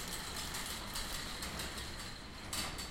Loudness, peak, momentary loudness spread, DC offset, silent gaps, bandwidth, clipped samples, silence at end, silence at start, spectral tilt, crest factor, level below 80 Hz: -41 LUFS; -26 dBFS; 5 LU; under 0.1%; none; 16.5 kHz; under 0.1%; 0 s; 0 s; -2 dB/octave; 16 dB; -50 dBFS